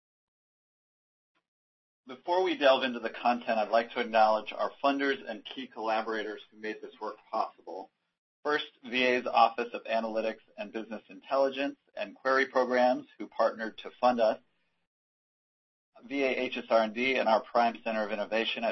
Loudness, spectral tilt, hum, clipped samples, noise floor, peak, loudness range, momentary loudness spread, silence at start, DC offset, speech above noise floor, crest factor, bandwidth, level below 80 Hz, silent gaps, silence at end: -29 LUFS; -4.5 dB/octave; none; under 0.1%; under -90 dBFS; -8 dBFS; 5 LU; 15 LU; 2.1 s; under 0.1%; over 60 dB; 22 dB; 6.2 kHz; -76 dBFS; 8.18-8.43 s, 14.87-15.92 s; 0 s